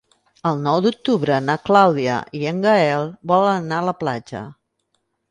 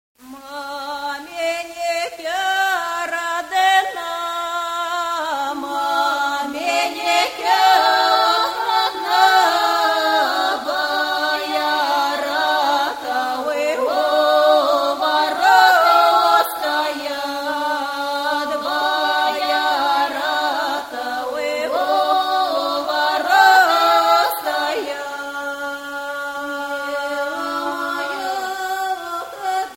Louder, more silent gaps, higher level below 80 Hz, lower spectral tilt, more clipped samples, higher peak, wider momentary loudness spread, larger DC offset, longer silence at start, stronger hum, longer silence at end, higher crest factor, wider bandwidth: about the same, -19 LUFS vs -18 LUFS; neither; about the same, -60 dBFS vs -62 dBFS; first, -6.5 dB/octave vs -0.5 dB/octave; neither; about the same, 0 dBFS vs 0 dBFS; about the same, 11 LU vs 12 LU; neither; first, 0.45 s vs 0.25 s; neither; first, 0.8 s vs 0 s; about the same, 18 dB vs 18 dB; second, 10.5 kHz vs 16.5 kHz